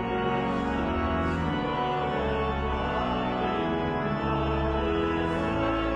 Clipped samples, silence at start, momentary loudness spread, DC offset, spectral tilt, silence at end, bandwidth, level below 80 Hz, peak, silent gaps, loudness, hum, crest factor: under 0.1%; 0 s; 1 LU; under 0.1%; -7.5 dB/octave; 0 s; 9.2 kHz; -38 dBFS; -16 dBFS; none; -28 LUFS; none; 12 dB